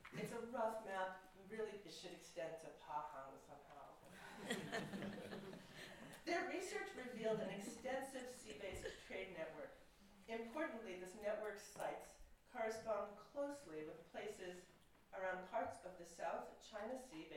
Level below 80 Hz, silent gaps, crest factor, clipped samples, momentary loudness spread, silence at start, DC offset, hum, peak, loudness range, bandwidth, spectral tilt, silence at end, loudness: -74 dBFS; none; 20 dB; under 0.1%; 13 LU; 0 s; under 0.1%; none; -30 dBFS; 4 LU; 16.5 kHz; -4 dB/octave; 0 s; -49 LUFS